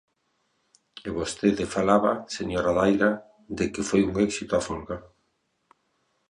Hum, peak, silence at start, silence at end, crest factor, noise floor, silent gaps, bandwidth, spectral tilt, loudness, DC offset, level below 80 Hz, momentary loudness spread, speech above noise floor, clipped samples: none; -6 dBFS; 0.95 s; 1.3 s; 20 dB; -73 dBFS; none; 11 kHz; -5.5 dB/octave; -25 LUFS; under 0.1%; -50 dBFS; 14 LU; 49 dB; under 0.1%